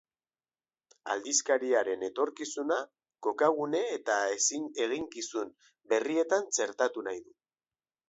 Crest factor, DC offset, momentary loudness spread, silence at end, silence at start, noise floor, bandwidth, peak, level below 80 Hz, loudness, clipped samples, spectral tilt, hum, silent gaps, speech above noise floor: 20 dB; under 0.1%; 10 LU; 0.85 s; 1.05 s; under -90 dBFS; 8.2 kHz; -14 dBFS; -80 dBFS; -31 LUFS; under 0.1%; -1.5 dB/octave; none; none; over 59 dB